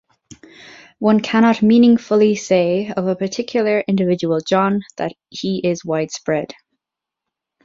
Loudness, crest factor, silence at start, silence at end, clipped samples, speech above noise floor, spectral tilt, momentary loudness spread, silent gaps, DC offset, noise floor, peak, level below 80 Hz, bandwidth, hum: -17 LUFS; 16 dB; 0.3 s; 1.1 s; under 0.1%; 68 dB; -6 dB/octave; 11 LU; none; under 0.1%; -84 dBFS; -2 dBFS; -60 dBFS; 7.6 kHz; none